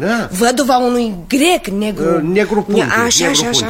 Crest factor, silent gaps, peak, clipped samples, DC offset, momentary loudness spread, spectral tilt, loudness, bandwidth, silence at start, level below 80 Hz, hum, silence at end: 14 dB; none; 0 dBFS; under 0.1%; under 0.1%; 6 LU; -3 dB/octave; -14 LUFS; 16.5 kHz; 0 s; -40 dBFS; none; 0 s